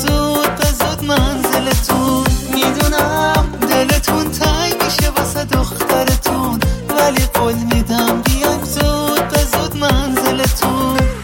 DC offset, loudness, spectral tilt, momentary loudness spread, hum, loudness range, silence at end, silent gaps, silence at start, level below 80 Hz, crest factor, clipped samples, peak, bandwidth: under 0.1%; -15 LUFS; -4.5 dB/octave; 3 LU; none; 1 LU; 0 s; none; 0 s; -22 dBFS; 14 dB; under 0.1%; 0 dBFS; 18 kHz